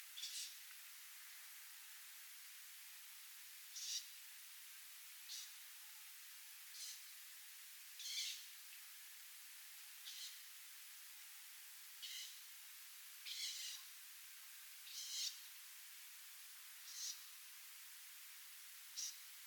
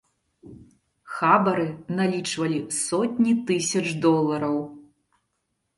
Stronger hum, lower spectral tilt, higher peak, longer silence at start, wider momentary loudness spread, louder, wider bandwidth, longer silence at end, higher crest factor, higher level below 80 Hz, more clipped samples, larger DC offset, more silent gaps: neither; second, 8 dB/octave vs -5 dB/octave; second, -32 dBFS vs -4 dBFS; second, 0 s vs 0.45 s; about the same, 9 LU vs 8 LU; second, -51 LUFS vs -23 LUFS; first, 19 kHz vs 11.5 kHz; second, 0 s vs 0.95 s; about the same, 24 dB vs 20 dB; second, under -90 dBFS vs -66 dBFS; neither; neither; neither